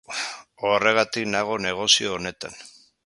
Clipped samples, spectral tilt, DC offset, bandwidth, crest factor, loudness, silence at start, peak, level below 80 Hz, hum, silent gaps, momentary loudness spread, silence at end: under 0.1%; -2 dB/octave; under 0.1%; 11.5 kHz; 22 dB; -22 LUFS; 0.1 s; -2 dBFS; -60 dBFS; none; none; 16 LU; 0.35 s